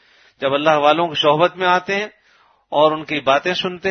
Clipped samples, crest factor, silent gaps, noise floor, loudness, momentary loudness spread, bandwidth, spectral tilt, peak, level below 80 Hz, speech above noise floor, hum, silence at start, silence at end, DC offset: under 0.1%; 18 dB; none; -56 dBFS; -17 LUFS; 8 LU; 6.6 kHz; -5 dB/octave; 0 dBFS; -62 dBFS; 39 dB; none; 0.4 s; 0 s; under 0.1%